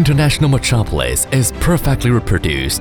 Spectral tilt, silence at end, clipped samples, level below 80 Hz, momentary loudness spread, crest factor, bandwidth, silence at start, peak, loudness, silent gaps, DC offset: -5 dB/octave; 0 s; under 0.1%; -24 dBFS; 4 LU; 12 dB; 20 kHz; 0 s; -2 dBFS; -15 LUFS; none; under 0.1%